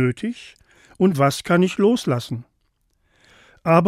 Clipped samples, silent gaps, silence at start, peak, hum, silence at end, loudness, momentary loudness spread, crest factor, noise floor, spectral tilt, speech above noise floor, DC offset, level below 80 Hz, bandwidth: under 0.1%; none; 0 s; -2 dBFS; none; 0 s; -20 LUFS; 14 LU; 18 dB; -67 dBFS; -6.5 dB/octave; 48 dB; under 0.1%; -60 dBFS; 15.5 kHz